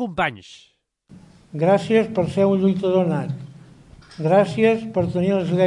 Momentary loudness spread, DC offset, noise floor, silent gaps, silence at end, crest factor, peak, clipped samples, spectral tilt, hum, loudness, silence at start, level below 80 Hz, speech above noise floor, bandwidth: 13 LU; under 0.1%; -49 dBFS; none; 0 s; 16 dB; -4 dBFS; under 0.1%; -7.5 dB/octave; none; -20 LUFS; 0 s; -56 dBFS; 30 dB; 10.5 kHz